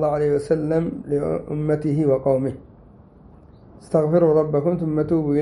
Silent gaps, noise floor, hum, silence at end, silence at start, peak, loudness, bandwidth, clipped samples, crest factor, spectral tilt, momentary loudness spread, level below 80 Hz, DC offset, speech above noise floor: none; -47 dBFS; none; 0 s; 0 s; -6 dBFS; -21 LUFS; 11 kHz; under 0.1%; 16 dB; -9.5 dB/octave; 7 LU; -48 dBFS; under 0.1%; 27 dB